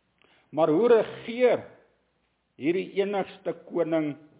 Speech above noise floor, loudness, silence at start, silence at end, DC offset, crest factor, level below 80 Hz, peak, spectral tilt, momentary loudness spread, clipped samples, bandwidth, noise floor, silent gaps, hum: 48 dB; -26 LUFS; 0.55 s; 0.25 s; under 0.1%; 18 dB; -74 dBFS; -10 dBFS; -10 dB/octave; 12 LU; under 0.1%; 4 kHz; -73 dBFS; none; none